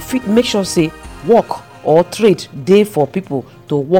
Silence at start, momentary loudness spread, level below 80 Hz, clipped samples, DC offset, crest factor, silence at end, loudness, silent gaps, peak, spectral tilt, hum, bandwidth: 0 s; 11 LU; -44 dBFS; under 0.1%; 0.2%; 12 dB; 0 s; -15 LUFS; none; -2 dBFS; -5.5 dB/octave; none; 17.5 kHz